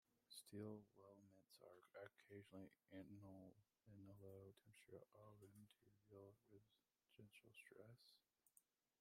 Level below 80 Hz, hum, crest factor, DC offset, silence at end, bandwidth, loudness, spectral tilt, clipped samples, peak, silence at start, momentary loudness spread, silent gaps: under -90 dBFS; none; 22 dB; under 0.1%; 0.4 s; 15 kHz; -64 LUFS; -5.5 dB/octave; under 0.1%; -44 dBFS; 0.1 s; 10 LU; none